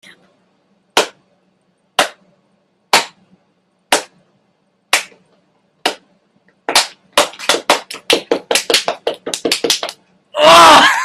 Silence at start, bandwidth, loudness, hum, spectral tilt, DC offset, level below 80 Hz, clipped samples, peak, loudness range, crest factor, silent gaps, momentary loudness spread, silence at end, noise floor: 0.95 s; over 20 kHz; -13 LUFS; none; -0.5 dB/octave; under 0.1%; -54 dBFS; 0.1%; 0 dBFS; 7 LU; 16 dB; none; 16 LU; 0 s; -61 dBFS